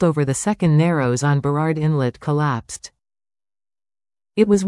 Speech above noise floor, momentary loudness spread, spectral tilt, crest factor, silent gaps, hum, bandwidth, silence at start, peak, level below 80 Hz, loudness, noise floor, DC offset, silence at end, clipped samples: over 72 dB; 10 LU; -6.5 dB/octave; 16 dB; none; none; 12 kHz; 0 s; -4 dBFS; -52 dBFS; -19 LUFS; under -90 dBFS; under 0.1%; 0 s; under 0.1%